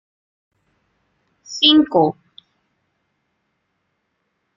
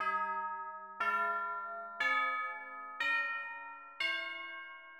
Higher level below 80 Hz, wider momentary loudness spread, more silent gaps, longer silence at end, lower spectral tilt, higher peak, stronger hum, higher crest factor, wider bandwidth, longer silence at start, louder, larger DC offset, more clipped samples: first, -62 dBFS vs -84 dBFS; first, 21 LU vs 13 LU; neither; first, 2.45 s vs 0 s; first, -4.5 dB/octave vs -1.5 dB/octave; first, -2 dBFS vs -22 dBFS; neither; first, 22 dB vs 16 dB; second, 7.4 kHz vs 16.5 kHz; first, 1.5 s vs 0 s; first, -14 LUFS vs -36 LUFS; neither; neither